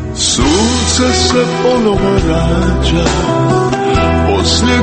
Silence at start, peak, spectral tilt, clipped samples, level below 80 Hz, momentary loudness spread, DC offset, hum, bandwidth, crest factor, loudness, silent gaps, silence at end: 0 s; 0 dBFS; -4.5 dB/octave; under 0.1%; -20 dBFS; 2 LU; under 0.1%; none; 8.8 kHz; 12 dB; -11 LUFS; none; 0 s